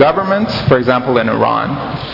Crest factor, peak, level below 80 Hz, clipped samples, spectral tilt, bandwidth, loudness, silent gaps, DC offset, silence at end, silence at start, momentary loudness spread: 14 dB; 0 dBFS; -42 dBFS; under 0.1%; -8 dB/octave; 5.8 kHz; -14 LUFS; none; under 0.1%; 0 s; 0 s; 6 LU